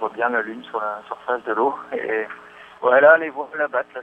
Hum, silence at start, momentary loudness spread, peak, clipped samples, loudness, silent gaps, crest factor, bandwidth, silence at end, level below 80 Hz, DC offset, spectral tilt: 60 Hz at -55 dBFS; 0 s; 15 LU; -2 dBFS; under 0.1%; -20 LUFS; none; 20 dB; 4 kHz; 0 s; -72 dBFS; under 0.1%; -6 dB/octave